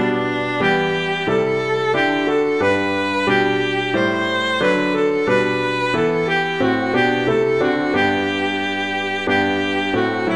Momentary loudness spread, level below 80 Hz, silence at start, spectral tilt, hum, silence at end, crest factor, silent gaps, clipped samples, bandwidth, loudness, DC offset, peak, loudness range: 3 LU; -52 dBFS; 0 s; -5.5 dB/octave; none; 0 s; 14 dB; none; under 0.1%; 11.5 kHz; -18 LUFS; 0.4%; -4 dBFS; 1 LU